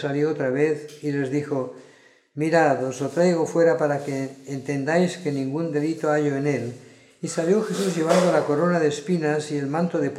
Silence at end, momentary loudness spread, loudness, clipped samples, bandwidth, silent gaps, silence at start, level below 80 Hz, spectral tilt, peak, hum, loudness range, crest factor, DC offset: 0 s; 10 LU; -23 LUFS; under 0.1%; 14 kHz; none; 0 s; -72 dBFS; -6 dB/octave; -4 dBFS; none; 2 LU; 18 dB; under 0.1%